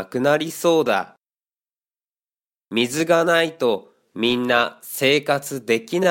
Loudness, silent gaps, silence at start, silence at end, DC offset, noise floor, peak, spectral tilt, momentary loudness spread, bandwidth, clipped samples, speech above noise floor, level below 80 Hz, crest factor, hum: -20 LUFS; none; 0 s; 0 s; under 0.1%; under -90 dBFS; -2 dBFS; -4 dB/octave; 7 LU; 17 kHz; under 0.1%; over 70 dB; -66 dBFS; 20 dB; none